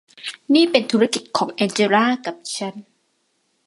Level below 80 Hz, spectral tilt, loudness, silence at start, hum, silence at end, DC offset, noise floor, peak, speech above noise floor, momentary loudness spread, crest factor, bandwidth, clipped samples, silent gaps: -70 dBFS; -4 dB/octave; -19 LUFS; 0.25 s; none; 0.85 s; under 0.1%; -68 dBFS; 0 dBFS; 49 dB; 13 LU; 20 dB; 11.5 kHz; under 0.1%; none